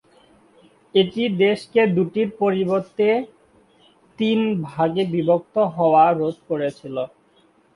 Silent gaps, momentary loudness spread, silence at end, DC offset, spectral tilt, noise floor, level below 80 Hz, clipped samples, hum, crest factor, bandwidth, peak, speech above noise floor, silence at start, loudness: none; 9 LU; 0.7 s; under 0.1%; -7.5 dB/octave; -58 dBFS; -64 dBFS; under 0.1%; none; 16 dB; 11 kHz; -4 dBFS; 38 dB; 0.95 s; -20 LUFS